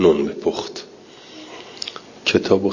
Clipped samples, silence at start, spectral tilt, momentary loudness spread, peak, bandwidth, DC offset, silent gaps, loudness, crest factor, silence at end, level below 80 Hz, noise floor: under 0.1%; 0 s; -5 dB/octave; 23 LU; -2 dBFS; 7.4 kHz; under 0.1%; none; -22 LUFS; 20 dB; 0 s; -50 dBFS; -43 dBFS